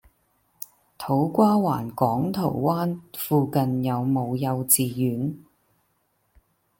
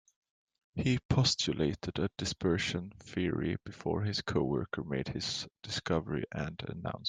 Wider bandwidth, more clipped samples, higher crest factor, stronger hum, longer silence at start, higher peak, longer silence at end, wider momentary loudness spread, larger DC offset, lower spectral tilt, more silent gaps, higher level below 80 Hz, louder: first, 17 kHz vs 9.8 kHz; neither; about the same, 22 dB vs 18 dB; neither; second, 0.6 s vs 0.75 s; first, -4 dBFS vs -16 dBFS; first, 1.4 s vs 0 s; first, 18 LU vs 10 LU; neither; about the same, -6 dB/octave vs -5 dB/octave; second, none vs 1.05-1.09 s; second, -62 dBFS vs -56 dBFS; first, -23 LUFS vs -34 LUFS